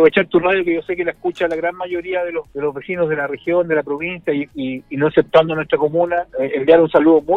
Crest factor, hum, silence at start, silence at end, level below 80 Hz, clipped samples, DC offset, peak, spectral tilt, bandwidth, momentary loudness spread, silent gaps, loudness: 16 dB; none; 0 s; 0 s; -52 dBFS; under 0.1%; under 0.1%; 0 dBFS; -8 dB/octave; 4.7 kHz; 11 LU; none; -18 LUFS